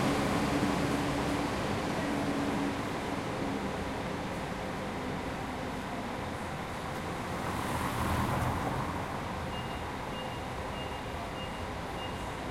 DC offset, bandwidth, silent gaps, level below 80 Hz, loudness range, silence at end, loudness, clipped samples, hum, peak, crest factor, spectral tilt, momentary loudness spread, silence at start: under 0.1%; 16.5 kHz; none; -48 dBFS; 5 LU; 0 s; -34 LUFS; under 0.1%; none; -16 dBFS; 18 dB; -5.5 dB/octave; 7 LU; 0 s